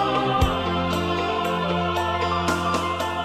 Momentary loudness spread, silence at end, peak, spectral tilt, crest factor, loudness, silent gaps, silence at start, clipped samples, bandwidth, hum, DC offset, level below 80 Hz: 2 LU; 0 s; -6 dBFS; -5.5 dB/octave; 16 dB; -23 LUFS; none; 0 s; under 0.1%; 15.5 kHz; none; under 0.1%; -38 dBFS